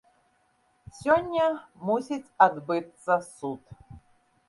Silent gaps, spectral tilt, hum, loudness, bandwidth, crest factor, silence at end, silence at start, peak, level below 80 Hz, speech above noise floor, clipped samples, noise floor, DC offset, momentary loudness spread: none; -5.5 dB/octave; none; -27 LUFS; 11.5 kHz; 24 dB; 0.5 s; 0.95 s; -6 dBFS; -62 dBFS; 42 dB; under 0.1%; -68 dBFS; under 0.1%; 14 LU